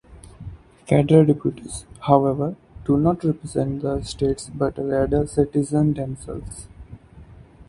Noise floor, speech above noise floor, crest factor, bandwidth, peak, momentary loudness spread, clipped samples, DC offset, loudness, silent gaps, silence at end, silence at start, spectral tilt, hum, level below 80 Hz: -45 dBFS; 24 dB; 22 dB; 11.5 kHz; 0 dBFS; 20 LU; under 0.1%; under 0.1%; -21 LUFS; none; 0.05 s; 0.1 s; -7.5 dB/octave; none; -42 dBFS